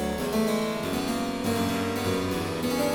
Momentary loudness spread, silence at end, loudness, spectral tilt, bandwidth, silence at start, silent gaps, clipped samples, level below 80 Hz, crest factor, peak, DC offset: 3 LU; 0 s; -27 LUFS; -5 dB/octave; 18 kHz; 0 s; none; under 0.1%; -48 dBFS; 12 dB; -14 dBFS; under 0.1%